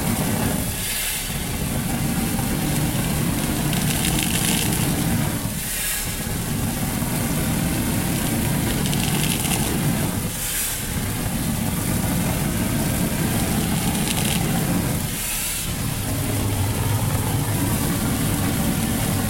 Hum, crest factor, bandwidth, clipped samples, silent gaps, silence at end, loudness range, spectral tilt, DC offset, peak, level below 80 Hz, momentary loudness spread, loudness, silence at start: none; 22 dB; 16.5 kHz; under 0.1%; none; 0 s; 2 LU; -4 dB/octave; under 0.1%; 0 dBFS; -34 dBFS; 4 LU; -22 LUFS; 0 s